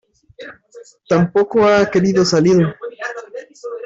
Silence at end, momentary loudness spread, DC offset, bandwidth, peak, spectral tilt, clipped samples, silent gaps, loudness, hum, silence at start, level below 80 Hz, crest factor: 0 s; 23 LU; under 0.1%; 7.8 kHz; -4 dBFS; -6 dB/octave; under 0.1%; none; -14 LUFS; none; 0.4 s; -52 dBFS; 14 dB